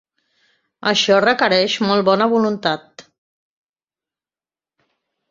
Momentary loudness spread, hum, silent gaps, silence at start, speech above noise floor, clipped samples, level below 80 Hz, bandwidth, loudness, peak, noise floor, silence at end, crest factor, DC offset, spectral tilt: 8 LU; none; none; 0.8 s; over 74 dB; under 0.1%; -64 dBFS; 7.6 kHz; -16 LUFS; -2 dBFS; under -90 dBFS; 2.3 s; 18 dB; under 0.1%; -4 dB/octave